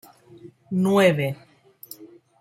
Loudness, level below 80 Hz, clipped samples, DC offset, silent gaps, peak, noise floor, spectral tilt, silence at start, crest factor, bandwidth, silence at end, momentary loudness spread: -21 LUFS; -66 dBFS; under 0.1%; under 0.1%; none; -6 dBFS; -48 dBFS; -6.5 dB/octave; 0.45 s; 20 dB; 16.5 kHz; 0.35 s; 24 LU